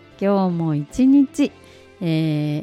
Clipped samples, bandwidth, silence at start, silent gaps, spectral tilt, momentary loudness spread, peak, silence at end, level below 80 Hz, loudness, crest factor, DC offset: under 0.1%; 11.5 kHz; 0.2 s; none; -7.5 dB/octave; 8 LU; -6 dBFS; 0 s; -52 dBFS; -19 LUFS; 12 dB; under 0.1%